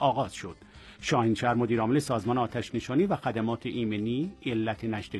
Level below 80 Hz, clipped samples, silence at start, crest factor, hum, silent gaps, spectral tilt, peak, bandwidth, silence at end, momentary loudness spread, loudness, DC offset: -56 dBFS; under 0.1%; 0 s; 18 dB; none; none; -6 dB/octave; -12 dBFS; 12.5 kHz; 0 s; 8 LU; -29 LUFS; under 0.1%